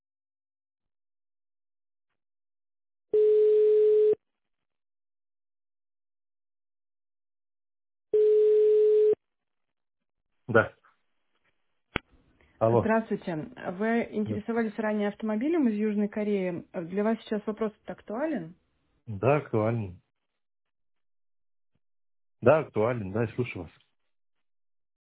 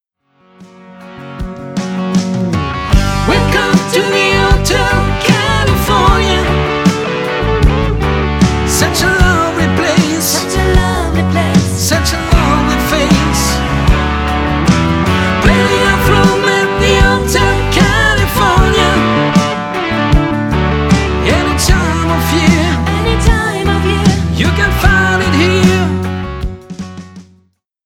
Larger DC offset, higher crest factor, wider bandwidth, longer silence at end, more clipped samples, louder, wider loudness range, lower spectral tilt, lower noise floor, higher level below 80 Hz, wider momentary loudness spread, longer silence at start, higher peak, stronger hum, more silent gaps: neither; first, 24 dB vs 12 dB; second, 4 kHz vs 18 kHz; first, 1.5 s vs 0.65 s; neither; second, -27 LUFS vs -11 LUFS; first, 7 LU vs 2 LU; first, -11 dB/octave vs -5 dB/octave; first, -87 dBFS vs -54 dBFS; second, -62 dBFS vs -18 dBFS; first, 15 LU vs 6 LU; first, 3.15 s vs 0.6 s; second, -6 dBFS vs 0 dBFS; neither; neither